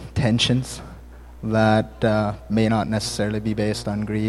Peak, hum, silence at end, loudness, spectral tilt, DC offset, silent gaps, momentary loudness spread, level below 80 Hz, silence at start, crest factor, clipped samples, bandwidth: -4 dBFS; none; 0 s; -22 LUFS; -5.5 dB/octave; under 0.1%; none; 10 LU; -42 dBFS; 0 s; 18 dB; under 0.1%; 12.5 kHz